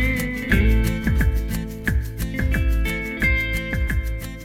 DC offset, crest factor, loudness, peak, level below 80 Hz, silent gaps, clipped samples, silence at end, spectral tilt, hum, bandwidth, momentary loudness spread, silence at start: under 0.1%; 16 dB; -22 LUFS; -4 dBFS; -24 dBFS; none; under 0.1%; 0 s; -6 dB/octave; none; 16.5 kHz; 6 LU; 0 s